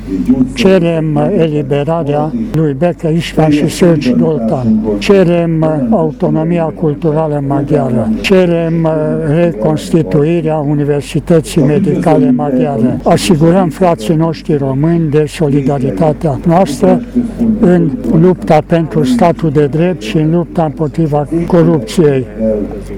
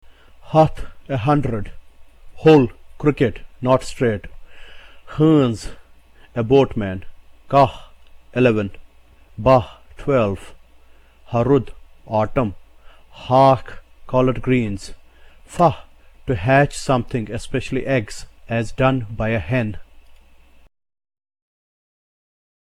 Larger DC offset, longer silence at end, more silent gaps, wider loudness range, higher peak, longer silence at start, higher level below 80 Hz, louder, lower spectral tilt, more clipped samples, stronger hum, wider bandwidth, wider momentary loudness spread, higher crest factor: neither; second, 0 s vs 2.9 s; neither; second, 1 LU vs 4 LU; about the same, 0 dBFS vs -2 dBFS; second, 0 s vs 0.45 s; first, -32 dBFS vs -40 dBFS; first, -11 LUFS vs -19 LUFS; about the same, -7.5 dB/octave vs -7 dB/octave; first, 0.3% vs under 0.1%; neither; first, 15 kHz vs 12 kHz; second, 5 LU vs 17 LU; second, 10 dB vs 18 dB